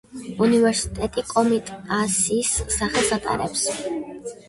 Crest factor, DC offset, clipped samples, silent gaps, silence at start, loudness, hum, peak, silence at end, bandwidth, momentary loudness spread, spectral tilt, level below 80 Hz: 16 dB; under 0.1%; under 0.1%; none; 0.1 s; -22 LUFS; none; -6 dBFS; 0.15 s; 11.5 kHz; 10 LU; -3.5 dB/octave; -42 dBFS